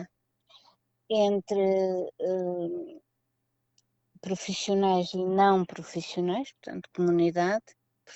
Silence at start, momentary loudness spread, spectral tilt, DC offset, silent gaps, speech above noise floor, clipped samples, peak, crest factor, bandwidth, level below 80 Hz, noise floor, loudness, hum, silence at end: 0 s; 15 LU; -5.5 dB/octave; under 0.1%; none; 52 dB; under 0.1%; -12 dBFS; 18 dB; 8.4 kHz; -74 dBFS; -79 dBFS; -28 LUFS; none; 0 s